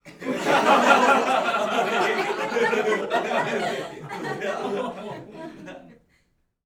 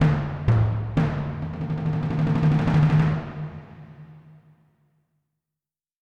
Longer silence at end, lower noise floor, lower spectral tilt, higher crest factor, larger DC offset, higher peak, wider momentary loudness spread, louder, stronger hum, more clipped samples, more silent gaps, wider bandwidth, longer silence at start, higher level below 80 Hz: second, 0.8 s vs 1.8 s; second, -68 dBFS vs under -90 dBFS; second, -3.5 dB/octave vs -9 dB/octave; about the same, 20 dB vs 16 dB; neither; first, -4 dBFS vs -8 dBFS; about the same, 20 LU vs 18 LU; about the same, -22 LUFS vs -23 LUFS; neither; neither; neither; first, 19.5 kHz vs 6 kHz; about the same, 0.05 s vs 0 s; second, -66 dBFS vs -40 dBFS